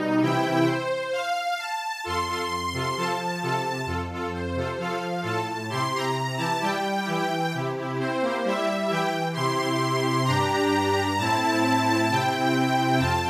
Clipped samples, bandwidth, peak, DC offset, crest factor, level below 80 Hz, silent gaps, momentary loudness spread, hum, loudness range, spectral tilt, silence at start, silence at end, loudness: under 0.1%; 15.5 kHz; -10 dBFS; under 0.1%; 16 dB; -54 dBFS; none; 7 LU; none; 5 LU; -5 dB/octave; 0 s; 0 s; -25 LUFS